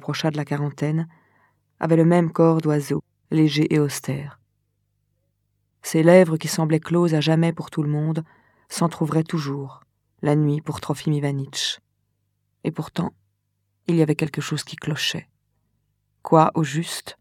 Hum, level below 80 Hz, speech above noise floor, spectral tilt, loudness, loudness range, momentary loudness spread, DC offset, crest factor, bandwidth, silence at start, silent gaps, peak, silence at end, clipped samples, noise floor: 50 Hz at -45 dBFS; -64 dBFS; 52 dB; -6 dB/octave; -22 LUFS; 6 LU; 13 LU; under 0.1%; 22 dB; 15 kHz; 0.05 s; none; 0 dBFS; 0.1 s; under 0.1%; -73 dBFS